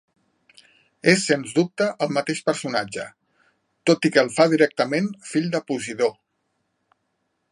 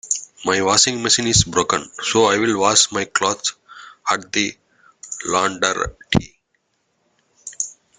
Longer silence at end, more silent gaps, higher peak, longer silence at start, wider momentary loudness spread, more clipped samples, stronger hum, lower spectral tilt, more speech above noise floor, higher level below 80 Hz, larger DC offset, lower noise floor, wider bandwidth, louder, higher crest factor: first, 1.4 s vs 0.25 s; neither; about the same, -2 dBFS vs 0 dBFS; first, 1.05 s vs 0.05 s; second, 8 LU vs 13 LU; neither; neither; first, -4.5 dB/octave vs -2.5 dB/octave; about the same, 52 dB vs 50 dB; second, -70 dBFS vs -44 dBFS; neither; first, -74 dBFS vs -69 dBFS; about the same, 11.5 kHz vs 10.5 kHz; second, -22 LUFS vs -18 LUFS; about the same, 22 dB vs 20 dB